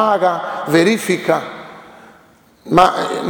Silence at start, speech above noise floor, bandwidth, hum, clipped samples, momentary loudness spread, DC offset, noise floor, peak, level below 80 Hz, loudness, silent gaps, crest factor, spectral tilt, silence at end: 0 s; 34 dB; over 20 kHz; none; under 0.1%; 17 LU; under 0.1%; -49 dBFS; 0 dBFS; -50 dBFS; -15 LUFS; none; 16 dB; -5 dB/octave; 0 s